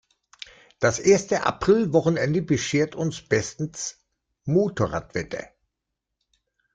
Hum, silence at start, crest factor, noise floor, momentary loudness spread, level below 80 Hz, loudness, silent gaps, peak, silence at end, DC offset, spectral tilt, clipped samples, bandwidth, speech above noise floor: none; 0.8 s; 20 dB; -83 dBFS; 16 LU; -54 dBFS; -23 LUFS; none; -6 dBFS; 1.3 s; under 0.1%; -5 dB/octave; under 0.1%; 9.4 kHz; 60 dB